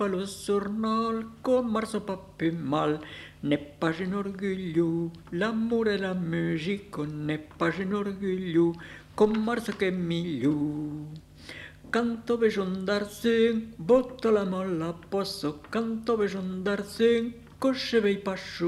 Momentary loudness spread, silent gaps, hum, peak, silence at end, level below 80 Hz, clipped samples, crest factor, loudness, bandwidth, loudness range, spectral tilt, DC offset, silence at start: 9 LU; none; 50 Hz at -55 dBFS; -10 dBFS; 0 s; -58 dBFS; under 0.1%; 18 dB; -28 LUFS; 14 kHz; 3 LU; -6.5 dB/octave; under 0.1%; 0 s